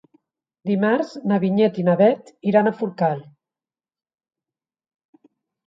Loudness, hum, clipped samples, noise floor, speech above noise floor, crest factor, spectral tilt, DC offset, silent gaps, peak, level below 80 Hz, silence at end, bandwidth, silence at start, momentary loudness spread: -20 LUFS; none; under 0.1%; under -90 dBFS; over 71 dB; 18 dB; -8.5 dB/octave; under 0.1%; none; -4 dBFS; -72 dBFS; 2.45 s; 7.6 kHz; 0.65 s; 8 LU